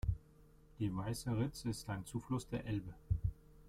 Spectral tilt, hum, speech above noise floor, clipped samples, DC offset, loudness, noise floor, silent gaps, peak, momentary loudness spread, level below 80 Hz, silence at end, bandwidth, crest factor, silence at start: -6.5 dB/octave; none; 23 dB; under 0.1%; under 0.1%; -42 LUFS; -64 dBFS; none; -24 dBFS; 5 LU; -50 dBFS; 0 s; 15.5 kHz; 18 dB; 0.05 s